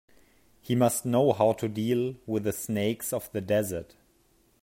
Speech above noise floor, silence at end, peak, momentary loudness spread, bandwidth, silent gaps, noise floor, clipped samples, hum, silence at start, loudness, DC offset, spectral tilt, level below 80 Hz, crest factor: 38 dB; 0.8 s; -10 dBFS; 8 LU; 16.5 kHz; none; -65 dBFS; under 0.1%; none; 0.65 s; -28 LUFS; under 0.1%; -5.5 dB/octave; -64 dBFS; 20 dB